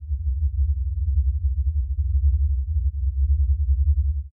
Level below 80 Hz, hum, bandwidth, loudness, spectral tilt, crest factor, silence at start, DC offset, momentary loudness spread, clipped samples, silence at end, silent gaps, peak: -22 dBFS; none; 0.2 kHz; -24 LUFS; -14.5 dB/octave; 10 dB; 0 s; under 0.1%; 4 LU; under 0.1%; 0.05 s; none; -12 dBFS